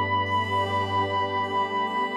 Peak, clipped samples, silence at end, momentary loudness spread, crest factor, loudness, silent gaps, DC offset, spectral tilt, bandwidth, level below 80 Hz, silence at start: -14 dBFS; under 0.1%; 0 s; 1 LU; 10 dB; -25 LUFS; none; under 0.1%; -5.5 dB/octave; 11.5 kHz; -74 dBFS; 0 s